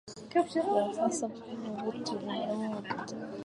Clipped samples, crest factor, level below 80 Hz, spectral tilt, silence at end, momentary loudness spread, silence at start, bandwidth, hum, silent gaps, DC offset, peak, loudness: under 0.1%; 18 dB; -74 dBFS; -4.5 dB/octave; 0 s; 9 LU; 0.05 s; 11.5 kHz; none; none; under 0.1%; -16 dBFS; -33 LUFS